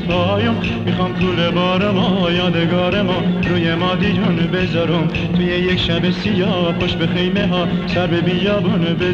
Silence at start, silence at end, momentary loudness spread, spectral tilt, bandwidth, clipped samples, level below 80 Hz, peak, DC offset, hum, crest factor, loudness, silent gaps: 0 s; 0 s; 2 LU; -7.5 dB/octave; 7 kHz; under 0.1%; -36 dBFS; -4 dBFS; under 0.1%; none; 12 dB; -17 LUFS; none